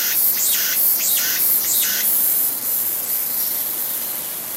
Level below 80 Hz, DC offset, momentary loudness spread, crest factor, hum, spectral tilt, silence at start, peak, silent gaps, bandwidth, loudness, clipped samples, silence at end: -70 dBFS; under 0.1%; 6 LU; 16 dB; none; 1 dB/octave; 0 s; -2 dBFS; none; 16 kHz; -16 LUFS; under 0.1%; 0 s